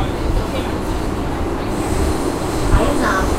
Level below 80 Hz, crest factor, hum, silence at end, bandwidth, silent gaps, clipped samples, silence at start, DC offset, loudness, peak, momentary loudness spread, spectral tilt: -22 dBFS; 16 dB; none; 0 s; 16 kHz; none; under 0.1%; 0 s; under 0.1%; -20 LUFS; -2 dBFS; 6 LU; -5.5 dB/octave